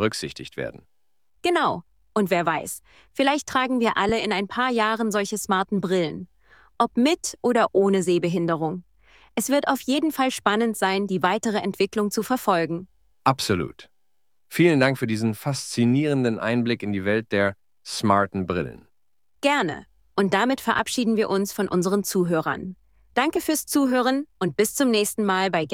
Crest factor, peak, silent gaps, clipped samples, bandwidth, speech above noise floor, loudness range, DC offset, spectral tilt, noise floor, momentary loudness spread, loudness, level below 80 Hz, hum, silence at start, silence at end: 20 dB; -4 dBFS; none; under 0.1%; 17 kHz; 57 dB; 2 LU; under 0.1%; -4.5 dB/octave; -80 dBFS; 9 LU; -23 LUFS; -58 dBFS; none; 0 s; 0 s